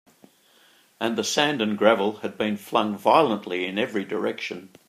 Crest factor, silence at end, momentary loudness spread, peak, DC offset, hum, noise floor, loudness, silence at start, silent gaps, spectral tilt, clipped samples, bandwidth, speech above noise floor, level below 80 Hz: 22 dB; 0.2 s; 9 LU; -2 dBFS; under 0.1%; none; -58 dBFS; -24 LUFS; 1 s; none; -4 dB/octave; under 0.1%; 15.5 kHz; 34 dB; -74 dBFS